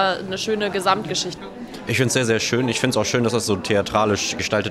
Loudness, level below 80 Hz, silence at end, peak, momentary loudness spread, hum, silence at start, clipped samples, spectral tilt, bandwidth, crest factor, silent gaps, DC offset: -21 LUFS; -52 dBFS; 0 s; -4 dBFS; 6 LU; none; 0 s; under 0.1%; -4 dB/octave; 16 kHz; 16 dB; none; under 0.1%